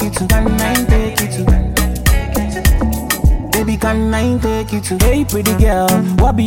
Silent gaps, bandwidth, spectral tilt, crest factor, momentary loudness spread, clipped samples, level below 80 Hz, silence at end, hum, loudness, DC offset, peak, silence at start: none; 17 kHz; -5 dB/octave; 14 dB; 4 LU; under 0.1%; -16 dBFS; 0 s; none; -15 LUFS; under 0.1%; 0 dBFS; 0 s